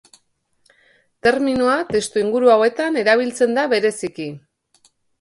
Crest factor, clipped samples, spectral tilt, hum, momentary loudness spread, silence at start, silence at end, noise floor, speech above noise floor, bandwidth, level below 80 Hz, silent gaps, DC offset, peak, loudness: 16 dB; under 0.1%; -4 dB/octave; none; 11 LU; 1.25 s; 0.85 s; -65 dBFS; 47 dB; 11.5 kHz; -56 dBFS; none; under 0.1%; -2 dBFS; -18 LUFS